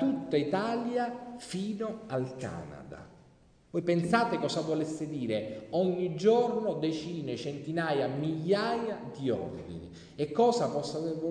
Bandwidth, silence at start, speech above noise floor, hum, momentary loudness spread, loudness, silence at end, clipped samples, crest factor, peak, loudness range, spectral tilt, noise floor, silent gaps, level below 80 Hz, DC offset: 10 kHz; 0 s; 30 dB; none; 13 LU; -31 LUFS; 0 s; under 0.1%; 18 dB; -14 dBFS; 5 LU; -6 dB/octave; -61 dBFS; none; -64 dBFS; under 0.1%